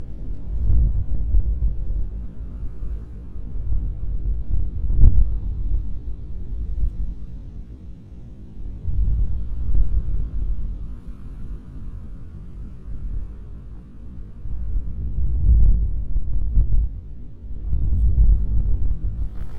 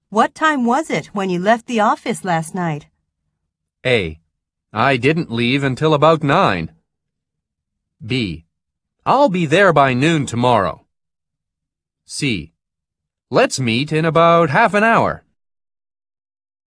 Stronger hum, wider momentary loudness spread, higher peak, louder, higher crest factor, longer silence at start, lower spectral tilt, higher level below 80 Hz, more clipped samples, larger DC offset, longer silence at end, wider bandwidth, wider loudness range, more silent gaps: neither; first, 19 LU vs 12 LU; about the same, 0 dBFS vs 0 dBFS; second, -26 LUFS vs -16 LUFS; about the same, 20 dB vs 18 dB; about the same, 0 s vs 0.1 s; first, -11 dB/octave vs -5.5 dB/octave; first, -22 dBFS vs -50 dBFS; neither; neither; second, 0 s vs 1.5 s; second, 1.5 kHz vs 11 kHz; first, 11 LU vs 5 LU; neither